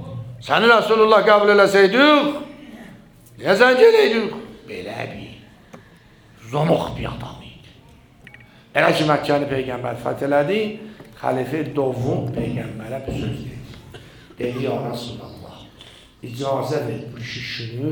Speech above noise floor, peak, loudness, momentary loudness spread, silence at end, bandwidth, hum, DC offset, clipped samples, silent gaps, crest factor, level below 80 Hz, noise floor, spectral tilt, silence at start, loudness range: 30 dB; 0 dBFS; -18 LUFS; 23 LU; 0 s; over 20 kHz; none; under 0.1%; under 0.1%; none; 20 dB; -50 dBFS; -49 dBFS; -5.5 dB/octave; 0 s; 13 LU